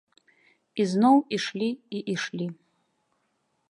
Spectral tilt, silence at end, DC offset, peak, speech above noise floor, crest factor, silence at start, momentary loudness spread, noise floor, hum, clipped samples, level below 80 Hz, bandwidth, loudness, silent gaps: -5.5 dB/octave; 1.15 s; under 0.1%; -8 dBFS; 49 dB; 20 dB; 0.75 s; 14 LU; -74 dBFS; none; under 0.1%; -78 dBFS; 11 kHz; -26 LUFS; none